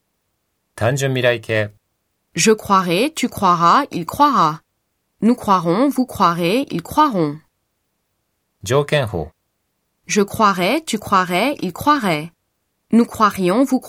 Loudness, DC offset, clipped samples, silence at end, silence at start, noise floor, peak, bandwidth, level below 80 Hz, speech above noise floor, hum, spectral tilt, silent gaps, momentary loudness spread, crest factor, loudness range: -17 LUFS; under 0.1%; under 0.1%; 0 s; 0.75 s; -71 dBFS; 0 dBFS; 16.5 kHz; -50 dBFS; 54 dB; none; -5 dB/octave; none; 9 LU; 18 dB; 5 LU